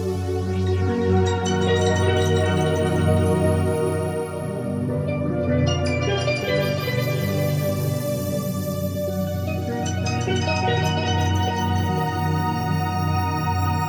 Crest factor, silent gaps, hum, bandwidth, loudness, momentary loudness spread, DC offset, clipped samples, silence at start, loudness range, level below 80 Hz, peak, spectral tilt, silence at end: 16 dB; none; none; 19.5 kHz; -22 LUFS; 6 LU; under 0.1%; under 0.1%; 0 s; 4 LU; -44 dBFS; -6 dBFS; -6 dB/octave; 0 s